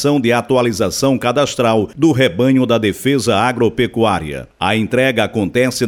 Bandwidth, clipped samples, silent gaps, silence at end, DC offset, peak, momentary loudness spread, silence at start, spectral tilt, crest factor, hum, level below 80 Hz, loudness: 18 kHz; under 0.1%; none; 0 s; under 0.1%; -2 dBFS; 4 LU; 0 s; -5 dB/octave; 14 dB; none; -44 dBFS; -15 LUFS